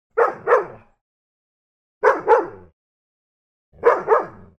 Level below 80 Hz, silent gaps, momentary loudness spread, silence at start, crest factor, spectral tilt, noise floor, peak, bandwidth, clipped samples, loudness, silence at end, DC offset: -60 dBFS; 1.01-2.01 s, 2.73-3.72 s; 4 LU; 0.15 s; 20 dB; -5.5 dB/octave; under -90 dBFS; -2 dBFS; 6.8 kHz; under 0.1%; -19 LUFS; 0.3 s; under 0.1%